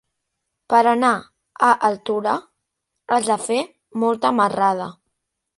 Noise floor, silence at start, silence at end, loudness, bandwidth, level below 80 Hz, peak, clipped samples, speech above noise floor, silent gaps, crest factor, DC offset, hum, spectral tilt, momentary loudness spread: -78 dBFS; 0.7 s; 0.65 s; -19 LUFS; 11.5 kHz; -68 dBFS; -2 dBFS; under 0.1%; 60 dB; none; 18 dB; under 0.1%; none; -4 dB/octave; 10 LU